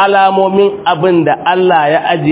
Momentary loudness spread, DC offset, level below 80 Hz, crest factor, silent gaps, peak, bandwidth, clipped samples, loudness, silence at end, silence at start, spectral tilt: 3 LU; under 0.1%; -52 dBFS; 10 dB; none; 0 dBFS; 4 kHz; 0.3%; -10 LUFS; 0 s; 0 s; -10 dB/octave